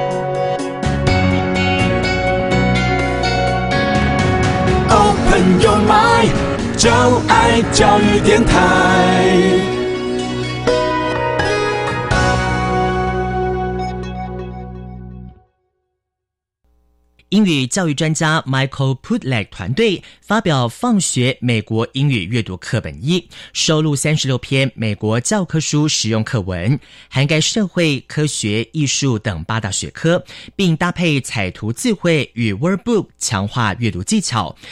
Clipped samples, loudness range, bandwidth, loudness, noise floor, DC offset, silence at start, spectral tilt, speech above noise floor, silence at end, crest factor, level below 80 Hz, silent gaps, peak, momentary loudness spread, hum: under 0.1%; 8 LU; 13.5 kHz; -16 LUFS; -81 dBFS; under 0.1%; 0 s; -5 dB/octave; 66 dB; 0 s; 16 dB; -30 dBFS; none; 0 dBFS; 9 LU; none